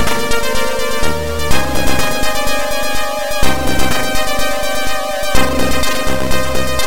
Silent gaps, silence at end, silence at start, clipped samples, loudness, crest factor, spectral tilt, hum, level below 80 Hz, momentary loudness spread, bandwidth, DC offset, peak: none; 0 s; 0 s; under 0.1%; -17 LUFS; 14 dB; -3.5 dB/octave; none; -24 dBFS; 2 LU; 17 kHz; 20%; 0 dBFS